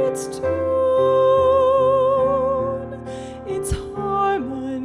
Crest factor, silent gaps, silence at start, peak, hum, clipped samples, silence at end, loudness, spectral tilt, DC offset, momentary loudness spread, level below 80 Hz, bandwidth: 12 dB; none; 0 s; -8 dBFS; none; under 0.1%; 0 s; -19 LUFS; -6 dB/octave; under 0.1%; 13 LU; -40 dBFS; 13 kHz